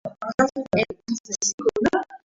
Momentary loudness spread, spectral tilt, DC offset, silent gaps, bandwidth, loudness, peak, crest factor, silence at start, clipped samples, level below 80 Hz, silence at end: 7 LU; -3.5 dB/octave; under 0.1%; 0.34-0.38 s, 1.20-1.24 s, 1.54-1.58 s; 8 kHz; -24 LUFS; -6 dBFS; 18 dB; 0.05 s; under 0.1%; -54 dBFS; 0.1 s